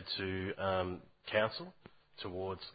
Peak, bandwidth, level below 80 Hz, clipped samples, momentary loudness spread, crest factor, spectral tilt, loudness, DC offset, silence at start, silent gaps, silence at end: -16 dBFS; 4.9 kHz; -58 dBFS; under 0.1%; 13 LU; 22 dB; -3 dB/octave; -38 LUFS; under 0.1%; 0 s; none; 0 s